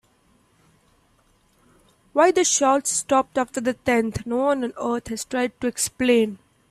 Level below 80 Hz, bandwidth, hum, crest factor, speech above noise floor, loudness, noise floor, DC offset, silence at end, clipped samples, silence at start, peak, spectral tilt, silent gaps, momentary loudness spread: -56 dBFS; 15.5 kHz; none; 18 dB; 40 dB; -22 LUFS; -61 dBFS; under 0.1%; 0.35 s; under 0.1%; 2.15 s; -4 dBFS; -3 dB/octave; none; 9 LU